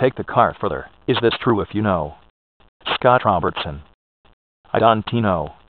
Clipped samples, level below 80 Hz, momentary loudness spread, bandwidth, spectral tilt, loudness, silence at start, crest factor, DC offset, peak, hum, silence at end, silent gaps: under 0.1%; -46 dBFS; 12 LU; 4.6 kHz; -10 dB/octave; -19 LUFS; 0 s; 20 dB; 0.2%; 0 dBFS; none; 0.2 s; 2.30-2.60 s, 2.69-2.80 s, 3.94-4.24 s, 4.33-4.64 s